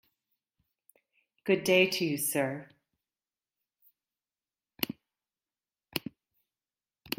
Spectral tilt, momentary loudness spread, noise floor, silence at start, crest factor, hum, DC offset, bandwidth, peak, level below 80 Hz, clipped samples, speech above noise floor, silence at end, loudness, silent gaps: -3.5 dB/octave; 18 LU; under -90 dBFS; 1.45 s; 24 dB; none; under 0.1%; 16.5 kHz; -10 dBFS; -74 dBFS; under 0.1%; over 62 dB; 0.05 s; -30 LUFS; none